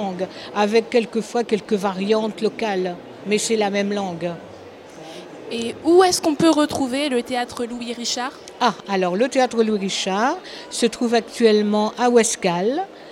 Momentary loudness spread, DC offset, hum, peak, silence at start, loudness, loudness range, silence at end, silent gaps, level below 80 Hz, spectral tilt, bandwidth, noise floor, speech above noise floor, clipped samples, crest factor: 13 LU; under 0.1%; none; -2 dBFS; 0 s; -20 LUFS; 4 LU; 0 s; none; -62 dBFS; -4 dB/octave; 16 kHz; -40 dBFS; 20 dB; under 0.1%; 18 dB